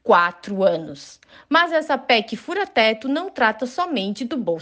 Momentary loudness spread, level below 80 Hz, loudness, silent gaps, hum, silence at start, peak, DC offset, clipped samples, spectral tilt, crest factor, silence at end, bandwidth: 8 LU; -68 dBFS; -20 LUFS; none; none; 0.05 s; -2 dBFS; under 0.1%; under 0.1%; -4.5 dB/octave; 18 dB; 0 s; 9.4 kHz